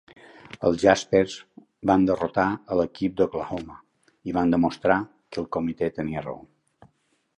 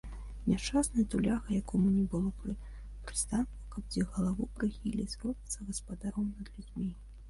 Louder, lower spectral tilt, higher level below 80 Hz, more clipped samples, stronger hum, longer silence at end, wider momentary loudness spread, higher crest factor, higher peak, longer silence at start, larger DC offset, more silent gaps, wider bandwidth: first, -24 LUFS vs -34 LUFS; about the same, -6 dB/octave vs -5.5 dB/octave; second, -52 dBFS vs -44 dBFS; neither; neither; first, 1 s vs 0 s; first, 15 LU vs 12 LU; first, 22 dB vs 16 dB; first, -4 dBFS vs -18 dBFS; first, 0.6 s vs 0.05 s; neither; neither; second, 10 kHz vs 11.5 kHz